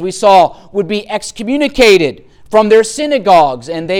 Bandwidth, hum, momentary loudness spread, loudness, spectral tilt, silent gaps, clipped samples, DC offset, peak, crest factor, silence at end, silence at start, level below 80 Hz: 17 kHz; none; 11 LU; -11 LUFS; -4 dB/octave; none; under 0.1%; under 0.1%; 0 dBFS; 10 dB; 0 s; 0 s; -40 dBFS